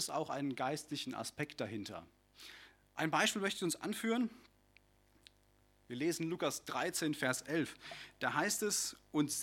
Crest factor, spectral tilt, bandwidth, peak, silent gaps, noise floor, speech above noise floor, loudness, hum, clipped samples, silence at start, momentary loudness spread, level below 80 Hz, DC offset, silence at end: 22 dB; -3 dB/octave; 17.5 kHz; -18 dBFS; none; -70 dBFS; 32 dB; -37 LUFS; 50 Hz at -75 dBFS; under 0.1%; 0 s; 16 LU; -74 dBFS; under 0.1%; 0 s